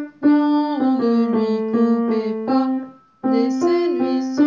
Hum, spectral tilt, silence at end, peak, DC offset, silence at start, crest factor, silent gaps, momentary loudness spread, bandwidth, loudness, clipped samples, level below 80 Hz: none; -7 dB/octave; 0 s; -6 dBFS; under 0.1%; 0 s; 12 dB; none; 5 LU; 7.4 kHz; -19 LUFS; under 0.1%; -70 dBFS